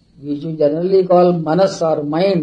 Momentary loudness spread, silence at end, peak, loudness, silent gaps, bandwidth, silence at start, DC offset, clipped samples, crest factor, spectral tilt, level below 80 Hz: 12 LU; 0 s; -2 dBFS; -15 LUFS; none; 9.4 kHz; 0.2 s; under 0.1%; under 0.1%; 12 dB; -7.5 dB/octave; -58 dBFS